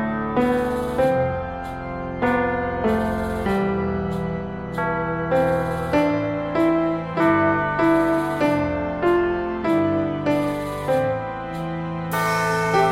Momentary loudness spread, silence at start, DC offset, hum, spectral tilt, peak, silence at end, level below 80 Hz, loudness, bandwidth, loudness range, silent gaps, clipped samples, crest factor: 9 LU; 0 s; under 0.1%; none; -7 dB/octave; -6 dBFS; 0 s; -42 dBFS; -22 LUFS; 16 kHz; 3 LU; none; under 0.1%; 16 dB